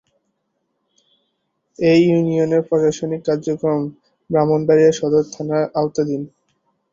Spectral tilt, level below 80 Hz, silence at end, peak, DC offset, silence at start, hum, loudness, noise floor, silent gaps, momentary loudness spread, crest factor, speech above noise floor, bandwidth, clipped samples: -7 dB/octave; -58 dBFS; 0.65 s; -2 dBFS; under 0.1%; 1.8 s; none; -18 LUFS; -72 dBFS; none; 9 LU; 16 dB; 55 dB; 7.6 kHz; under 0.1%